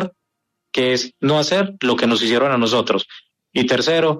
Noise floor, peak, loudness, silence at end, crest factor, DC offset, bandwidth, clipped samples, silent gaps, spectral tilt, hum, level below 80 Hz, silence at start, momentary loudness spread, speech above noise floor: -77 dBFS; -4 dBFS; -18 LUFS; 0 s; 14 dB; under 0.1%; 13.5 kHz; under 0.1%; none; -4.5 dB/octave; none; -60 dBFS; 0 s; 8 LU; 59 dB